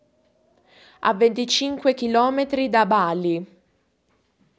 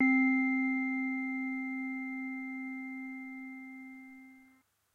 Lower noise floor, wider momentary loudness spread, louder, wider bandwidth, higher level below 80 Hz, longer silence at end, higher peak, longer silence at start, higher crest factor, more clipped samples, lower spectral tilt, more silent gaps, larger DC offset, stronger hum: about the same, -67 dBFS vs -67 dBFS; second, 7 LU vs 20 LU; first, -21 LUFS vs -34 LUFS; first, 8 kHz vs 4.2 kHz; first, -64 dBFS vs -88 dBFS; first, 1.15 s vs 0.5 s; first, -4 dBFS vs -18 dBFS; first, 1 s vs 0 s; about the same, 18 dB vs 16 dB; neither; second, -4 dB/octave vs -5.5 dB/octave; neither; neither; neither